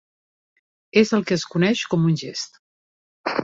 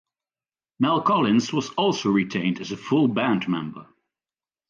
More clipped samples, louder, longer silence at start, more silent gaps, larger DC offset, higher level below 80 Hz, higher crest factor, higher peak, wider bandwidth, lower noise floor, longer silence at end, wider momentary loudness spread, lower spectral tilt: neither; about the same, -21 LUFS vs -23 LUFS; first, 0.95 s vs 0.8 s; first, 2.59-3.24 s vs none; neither; about the same, -62 dBFS vs -66 dBFS; about the same, 20 dB vs 16 dB; first, -4 dBFS vs -8 dBFS; about the same, 7.8 kHz vs 7.4 kHz; about the same, under -90 dBFS vs under -90 dBFS; second, 0 s vs 0.85 s; first, 13 LU vs 8 LU; about the same, -5.5 dB/octave vs -5.5 dB/octave